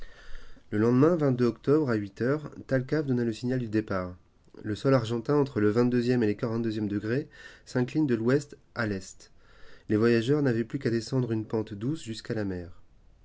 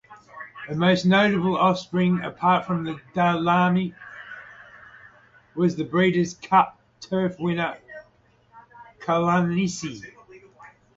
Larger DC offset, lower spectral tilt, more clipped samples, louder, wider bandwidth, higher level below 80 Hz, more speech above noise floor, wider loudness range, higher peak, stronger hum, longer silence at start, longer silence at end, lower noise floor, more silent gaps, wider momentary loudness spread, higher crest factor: neither; first, -7.5 dB/octave vs -6 dB/octave; neither; second, -28 LUFS vs -22 LUFS; about the same, 8 kHz vs 7.8 kHz; about the same, -56 dBFS vs -60 dBFS; second, 21 dB vs 38 dB; about the same, 3 LU vs 5 LU; second, -10 dBFS vs -6 dBFS; neither; about the same, 0 s vs 0.1 s; about the same, 0.4 s vs 0.3 s; second, -49 dBFS vs -60 dBFS; neither; second, 11 LU vs 21 LU; about the same, 18 dB vs 18 dB